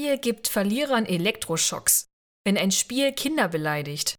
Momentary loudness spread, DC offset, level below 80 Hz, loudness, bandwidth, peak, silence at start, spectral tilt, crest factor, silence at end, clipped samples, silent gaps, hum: 5 LU; under 0.1%; -60 dBFS; -24 LUFS; over 20 kHz; -6 dBFS; 0 s; -3 dB/octave; 18 dB; 0.05 s; under 0.1%; 2.13-2.44 s; none